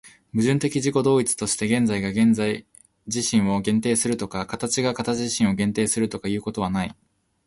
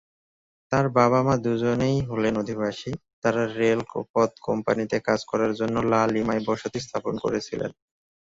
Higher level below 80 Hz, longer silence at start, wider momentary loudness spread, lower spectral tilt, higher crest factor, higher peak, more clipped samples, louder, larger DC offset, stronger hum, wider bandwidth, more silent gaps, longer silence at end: about the same, -52 dBFS vs -56 dBFS; second, 0.05 s vs 0.7 s; about the same, 8 LU vs 8 LU; second, -4.5 dB/octave vs -6.5 dB/octave; about the same, 16 dB vs 18 dB; about the same, -8 dBFS vs -6 dBFS; neither; about the same, -23 LUFS vs -25 LUFS; neither; neither; first, 11.5 kHz vs 7.8 kHz; second, none vs 3.13-3.22 s, 4.10-4.14 s; about the same, 0.55 s vs 0.55 s